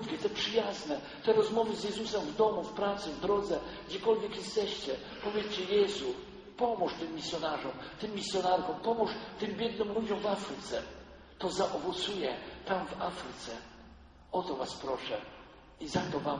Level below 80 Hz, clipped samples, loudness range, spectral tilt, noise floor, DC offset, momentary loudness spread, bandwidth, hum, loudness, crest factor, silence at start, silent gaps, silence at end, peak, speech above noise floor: -60 dBFS; under 0.1%; 5 LU; -4.5 dB/octave; -55 dBFS; under 0.1%; 11 LU; 9.6 kHz; none; -34 LUFS; 18 dB; 0 s; none; 0 s; -16 dBFS; 21 dB